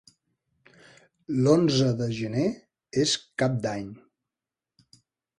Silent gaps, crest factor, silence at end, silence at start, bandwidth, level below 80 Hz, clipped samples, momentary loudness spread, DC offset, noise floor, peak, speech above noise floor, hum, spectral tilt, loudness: none; 20 dB; 1.45 s; 1.3 s; 11 kHz; -62 dBFS; under 0.1%; 12 LU; under 0.1%; -90 dBFS; -8 dBFS; 65 dB; none; -5.5 dB/octave; -26 LUFS